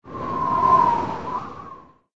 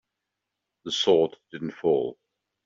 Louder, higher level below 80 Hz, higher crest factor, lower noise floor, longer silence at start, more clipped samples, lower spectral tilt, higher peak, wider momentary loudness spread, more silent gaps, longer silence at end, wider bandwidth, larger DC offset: first, -21 LUFS vs -25 LUFS; first, -50 dBFS vs -70 dBFS; about the same, 18 dB vs 20 dB; second, -43 dBFS vs -84 dBFS; second, 0.05 s vs 0.85 s; neither; first, -7 dB/octave vs -4.5 dB/octave; about the same, -6 dBFS vs -8 dBFS; first, 21 LU vs 15 LU; neither; second, 0.3 s vs 0.55 s; about the same, 7.6 kHz vs 7.6 kHz; neither